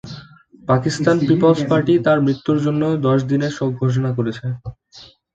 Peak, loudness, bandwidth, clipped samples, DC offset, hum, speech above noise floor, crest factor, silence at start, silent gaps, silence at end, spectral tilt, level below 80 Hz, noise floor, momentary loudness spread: -2 dBFS; -18 LUFS; 8.8 kHz; under 0.1%; under 0.1%; none; 29 dB; 16 dB; 0.05 s; none; 0.3 s; -7.5 dB/octave; -52 dBFS; -45 dBFS; 15 LU